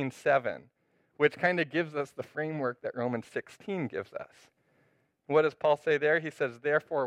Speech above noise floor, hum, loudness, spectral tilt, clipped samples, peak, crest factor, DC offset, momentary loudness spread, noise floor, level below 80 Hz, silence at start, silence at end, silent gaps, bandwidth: 40 dB; none; -30 LUFS; -6.5 dB/octave; under 0.1%; -10 dBFS; 20 dB; under 0.1%; 12 LU; -71 dBFS; -78 dBFS; 0 s; 0 s; none; 11 kHz